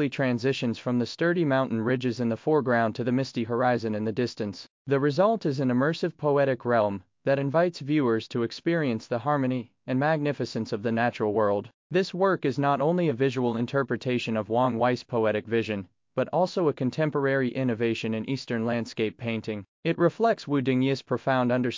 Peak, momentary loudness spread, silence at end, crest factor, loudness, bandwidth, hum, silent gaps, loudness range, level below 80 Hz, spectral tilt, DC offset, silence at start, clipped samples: -10 dBFS; 7 LU; 0 s; 16 dB; -26 LUFS; 7.6 kHz; none; 4.70-4.85 s, 11.74-11.90 s, 19.68-19.83 s; 2 LU; -66 dBFS; -7 dB/octave; under 0.1%; 0 s; under 0.1%